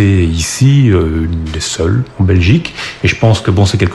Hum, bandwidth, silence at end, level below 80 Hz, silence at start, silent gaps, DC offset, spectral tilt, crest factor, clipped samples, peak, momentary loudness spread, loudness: none; 12 kHz; 0 s; -26 dBFS; 0 s; none; 0.2%; -6 dB/octave; 10 dB; under 0.1%; 0 dBFS; 8 LU; -12 LUFS